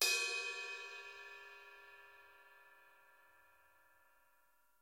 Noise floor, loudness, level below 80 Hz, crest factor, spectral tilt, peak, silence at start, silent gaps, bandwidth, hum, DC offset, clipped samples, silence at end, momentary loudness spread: -76 dBFS; -41 LUFS; -90 dBFS; 26 dB; 3 dB/octave; -20 dBFS; 0 s; none; 16 kHz; none; under 0.1%; under 0.1%; 1.85 s; 26 LU